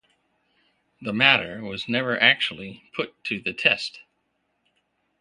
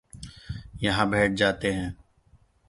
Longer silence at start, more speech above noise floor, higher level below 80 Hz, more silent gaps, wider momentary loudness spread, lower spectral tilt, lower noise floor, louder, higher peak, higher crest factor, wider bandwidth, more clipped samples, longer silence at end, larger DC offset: first, 1 s vs 0.15 s; first, 49 dB vs 36 dB; second, -64 dBFS vs -46 dBFS; neither; about the same, 16 LU vs 18 LU; about the same, -4 dB/octave vs -5 dB/octave; first, -73 dBFS vs -60 dBFS; first, -22 LUFS vs -25 LUFS; first, 0 dBFS vs -6 dBFS; about the same, 26 dB vs 22 dB; about the same, 11 kHz vs 11.5 kHz; neither; first, 1.2 s vs 0.75 s; neither